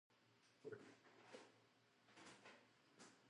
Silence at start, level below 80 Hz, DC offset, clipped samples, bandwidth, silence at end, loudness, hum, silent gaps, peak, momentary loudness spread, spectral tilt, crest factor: 0.1 s; under -90 dBFS; under 0.1%; under 0.1%; 11 kHz; 0 s; -64 LUFS; none; none; -44 dBFS; 8 LU; -3.5 dB/octave; 22 dB